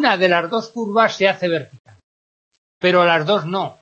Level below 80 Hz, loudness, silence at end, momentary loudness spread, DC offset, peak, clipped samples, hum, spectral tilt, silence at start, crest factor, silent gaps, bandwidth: -70 dBFS; -17 LUFS; 0.1 s; 9 LU; under 0.1%; 0 dBFS; under 0.1%; none; -5.5 dB/octave; 0 s; 18 dB; 1.79-1.85 s, 2.03-2.51 s, 2.58-2.81 s; 8 kHz